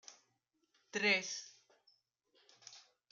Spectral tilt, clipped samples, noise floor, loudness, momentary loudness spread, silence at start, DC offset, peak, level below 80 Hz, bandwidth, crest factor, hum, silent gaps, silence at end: -1.5 dB/octave; under 0.1%; -82 dBFS; -36 LUFS; 25 LU; 0.1 s; under 0.1%; -20 dBFS; under -90 dBFS; 10 kHz; 24 dB; none; none; 0.3 s